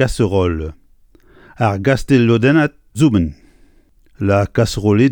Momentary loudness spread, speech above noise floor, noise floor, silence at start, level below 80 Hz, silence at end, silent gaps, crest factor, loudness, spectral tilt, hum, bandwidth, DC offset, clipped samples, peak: 9 LU; 36 dB; -50 dBFS; 0 s; -34 dBFS; 0 s; none; 14 dB; -16 LUFS; -7 dB/octave; none; 18 kHz; under 0.1%; under 0.1%; 0 dBFS